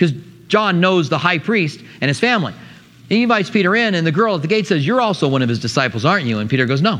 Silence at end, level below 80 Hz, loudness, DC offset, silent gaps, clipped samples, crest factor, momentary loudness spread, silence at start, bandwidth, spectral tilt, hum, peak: 0 s; -60 dBFS; -16 LUFS; under 0.1%; none; under 0.1%; 16 dB; 5 LU; 0 s; 11 kHz; -6 dB/octave; none; 0 dBFS